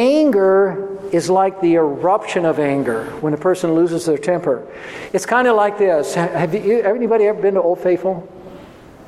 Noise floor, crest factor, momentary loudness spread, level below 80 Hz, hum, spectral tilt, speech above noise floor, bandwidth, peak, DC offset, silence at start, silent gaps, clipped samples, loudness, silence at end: -40 dBFS; 16 dB; 9 LU; -58 dBFS; none; -6 dB/octave; 24 dB; 13 kHz; -2 dBFS; under 0.1%; 0 s; none; under 0.1%; -17 LUFS; 0.05 s